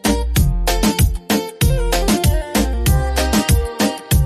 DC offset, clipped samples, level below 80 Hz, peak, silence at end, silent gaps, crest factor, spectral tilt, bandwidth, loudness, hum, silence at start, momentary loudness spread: under 0.1%; under 0.1%; -20 dBFS; -2 dBFS; 0 s; none; 12 dB; -5 dB/octave; 15.5 kHz; -17 LUFS; none; 0.05 s; 4 LU